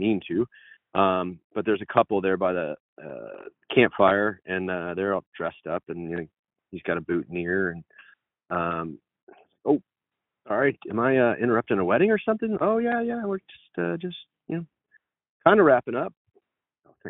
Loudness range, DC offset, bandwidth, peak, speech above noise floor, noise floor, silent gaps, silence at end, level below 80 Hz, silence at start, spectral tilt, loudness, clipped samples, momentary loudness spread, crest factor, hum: 6 LU; under 0.1%; 4 kHz; -4 dBFS; 62 dB; -87 dBFS; 1.44-1.50 s, 2.80-2.97 s, 5.27-5.32 s, 6.39-6.43 s, 9.23-9.27 s, 15.29-15.40 s, 16.17-16.25 s; 0 s; -64 dBFS; 0 s; -4.5 dB/octave; -25 LUFS; under 0.1%; 16 LU; 22 dB; none